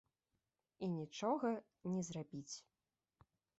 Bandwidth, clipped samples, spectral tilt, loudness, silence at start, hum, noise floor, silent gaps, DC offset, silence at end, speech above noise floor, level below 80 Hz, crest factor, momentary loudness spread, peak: 8 kHz; under 0.1%; -6.5 dB/octave; -44 LUFS; 0.8 s; none; -89 dBFS; none; under 0.1%; 1 s; 47 dB; -82 dBFS; 18 dB; 11 LU; -26 dBFS